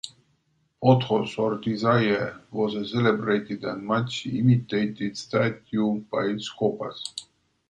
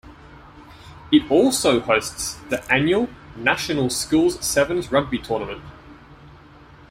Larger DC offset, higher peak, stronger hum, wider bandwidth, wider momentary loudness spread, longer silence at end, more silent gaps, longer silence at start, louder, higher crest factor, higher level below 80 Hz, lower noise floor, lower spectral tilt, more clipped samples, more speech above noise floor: neither; about the same, -4 dBFS vs -2 dBFS; neither; second, 9.4 kHz vs 16.5 kHz; about the same, 11 LU vs 10 LU; second, 0.45 s vs 0.6 s; neither; about the same, 0.05 s vs 0.05 s; second, -25 LUFS vs -20 LUFS; about the same, 20 dB vs 20 dB; second, -62 dBFS vs -48 dBFS; first, -69 dBFS vs -46 dBFS; first, -6.5 dB/octave vs -4 dB/octave; neither; first, 45 dB vs 26 dB